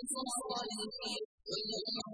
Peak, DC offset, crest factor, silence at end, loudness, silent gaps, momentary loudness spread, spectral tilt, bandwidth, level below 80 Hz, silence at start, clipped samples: -26 dBFS; under 0.1%; 16 dB; 0 s; -38 LUFS; 1.25-1.38 s; 4 LU; -2 dB/octave; 10.5 kHz; -74 dBFS; 0 s; under 0.1%